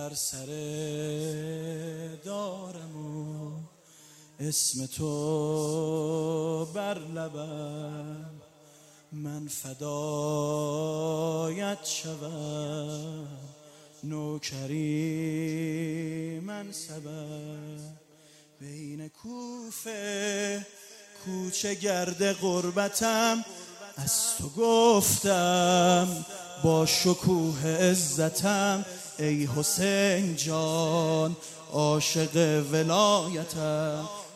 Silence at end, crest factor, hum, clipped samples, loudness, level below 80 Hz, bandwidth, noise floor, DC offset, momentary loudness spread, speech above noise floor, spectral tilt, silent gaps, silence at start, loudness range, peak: 0 s; 22 dB; none; under 0.1%; -28 LUFS; -66 dBFS; 16 kHz; -57 dBFS; under 0.1%; 17 LU; 29 dB; -4 dB/octave; none; 0 s; 13 LU; -8 dBFS